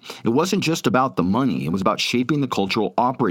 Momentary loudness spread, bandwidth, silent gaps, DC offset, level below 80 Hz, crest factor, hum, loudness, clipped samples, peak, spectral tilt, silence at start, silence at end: 2 LU; 17 kHz; none; under 0.1%; -60 dBFS; 16 dB; none; -21 LUFS; under 0.1%; -4 dBFS; -5.5 dB/octave; 0.05 s; 0 s